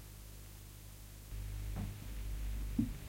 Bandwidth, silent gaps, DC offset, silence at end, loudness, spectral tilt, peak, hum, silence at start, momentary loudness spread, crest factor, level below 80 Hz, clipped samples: 16.5 kHz; none; under 0.1%; 0 s; -45 LUFS; -6 dB/octave; -22 dBFS; none; 0 s; 14 LU; 20 dB; -46 dBFS; under 0.1%